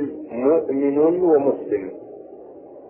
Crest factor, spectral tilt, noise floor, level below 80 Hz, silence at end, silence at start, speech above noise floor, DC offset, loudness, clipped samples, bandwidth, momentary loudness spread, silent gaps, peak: 14 dB; -12.5 dB/octave; -41 dBFS; -64 dBFS; 0 s; 0 s; 22 dB; under 0.1%; -20 LUFS; under 0.1%; 3 kHz; 22 LU; none; -6 dBFS